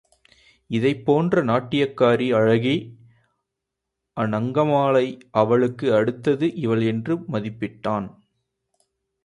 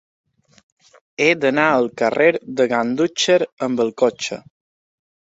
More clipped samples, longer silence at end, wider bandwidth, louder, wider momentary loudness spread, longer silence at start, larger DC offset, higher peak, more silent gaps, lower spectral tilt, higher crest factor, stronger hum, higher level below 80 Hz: neither; first, 1.15 s vs 1 s; first, 11 kHz vs 8 kHz; second, -21 LUFS vs -18 LUFS; about the same, 9 LU vs 9 LU; second, 0.7 s vs 1.2 s; neither; about the same, -4 dBFS vs -2 dBFS; second, none vs 3.53-3.57 s; first, -8 dB/octave vs -4 dB/octave; about the same, 18 dB vs 18 dB; neither; about the same, -60 dBFS vs -64 dBFS